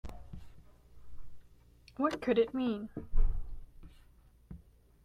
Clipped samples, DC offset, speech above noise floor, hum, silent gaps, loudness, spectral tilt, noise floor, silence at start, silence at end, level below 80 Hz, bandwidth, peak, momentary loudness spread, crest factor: under 0.1%; under 0.1%; 32 dB; none; none; -34 LUFS; -7 dB/octave; -61 dBFS; 0.05 s; 0.5 s; -38 dBFS; 6.4 kHz; -16 dBFS; 24 LU; 18 dB